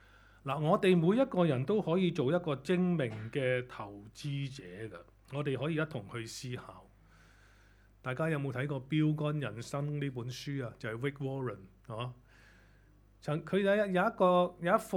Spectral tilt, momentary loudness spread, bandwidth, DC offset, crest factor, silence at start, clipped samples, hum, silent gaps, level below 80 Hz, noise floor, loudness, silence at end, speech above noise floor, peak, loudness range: -7 dB/octave; 17 LU; 14.5 kHz; under 0.1%; 20 dB; 0.45 s; under 0.1%; none; none; -64 dBFS; -62 dBFS; -33 LUFS; 0 s; 29 dB; -12 dBFS; 10 LU